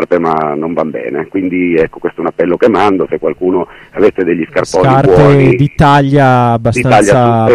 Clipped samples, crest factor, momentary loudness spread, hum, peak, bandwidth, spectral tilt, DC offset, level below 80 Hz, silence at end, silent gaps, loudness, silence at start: under 0.1%; 10 dB; 9 LU; none; 0 dBFS; 11.5 kHz; -7 dB/octave; under 0.1%; -34 dBFS; 0 s; none; -10 LUFS; 0 s